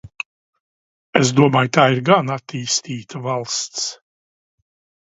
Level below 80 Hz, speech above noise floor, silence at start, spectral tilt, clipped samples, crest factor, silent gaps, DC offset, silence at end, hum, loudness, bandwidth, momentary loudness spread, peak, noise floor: -60 dBFS; over 72 dB; 0.05 s; -4.5 dB/octave; under 0.1%; 20 dB; 0.26-0.53 s, 0.60-1.13 s; under 0.1%; 1.1 s; none; -18 LUFS; 8 kHz; 15 LU; 0 dBFS; under -90 dBFS